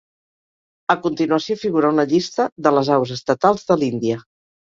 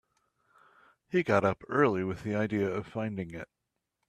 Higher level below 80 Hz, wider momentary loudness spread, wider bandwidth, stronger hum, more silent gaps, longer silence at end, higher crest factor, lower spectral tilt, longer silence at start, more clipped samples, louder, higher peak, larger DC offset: about the same, -60 dBFS vs -64 dBFS; second, 6 LU vs 13 LU; second, 7.6 kHz vs 12.5 kHz; neither; first, 2.52-2.56 s vs none; second, 0.5 s vs 0.65 s; about the same, 18 dB vs 22 dB; second, -6 dB/octave vs -7.5 dB/octave; second, 0.9 s vs 1.1 s; neither; first, -19 LUFS vs -30 LUFS; first, -2 dBFS vs -10 dBFS; neither